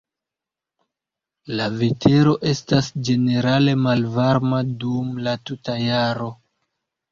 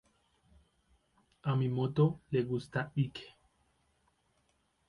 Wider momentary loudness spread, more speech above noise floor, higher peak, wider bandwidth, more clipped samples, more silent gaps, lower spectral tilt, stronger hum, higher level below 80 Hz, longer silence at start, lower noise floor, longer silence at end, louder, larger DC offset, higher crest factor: about the same, 9 LU vs 8 LU; first, 68 dB vs 43 dB; first, -2 dBFS vs -16 dBFS; second, 7.4 kHz vs 11 kHz; neither; neither; second, -6.5 dB/octave vs -8.5 dB/octave; neither; first, -52 dBFS vs -68 dBFS; about the same, 1.45 s vs 1.45 s; first, -87 dBFS vs -75 dBFS; second, 0.75 s vs 1.6 s; first, -20 LUFS vs -34 LUFS; neither; about the same, 18 dB vs 20 dB